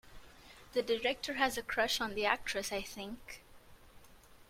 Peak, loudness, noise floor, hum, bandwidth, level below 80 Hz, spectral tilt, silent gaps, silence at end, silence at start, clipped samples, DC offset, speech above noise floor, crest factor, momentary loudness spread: -14 dBFS; -35 LUFS; -59 dBFS; none; 16.5 kHz; -60 dBFS; -2 dB/octave; none; 0.05 s; 0.05 s; under 0.1%; under 0.1%; 23 dB; 24 dB; 18 LU